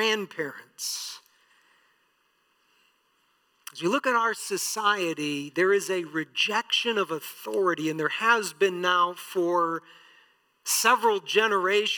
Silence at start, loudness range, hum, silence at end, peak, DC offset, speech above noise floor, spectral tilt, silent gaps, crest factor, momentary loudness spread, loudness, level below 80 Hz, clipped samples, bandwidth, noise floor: 0 s; 11 LU; none; 0 s; -8 dBFS; under 0.1%; 43 dB; -2 dB/octave; none; 20 dB; 12 LU; -25 LUFS; under -90 dBFS; under 0.1%; 19 kHz; -69 dBFS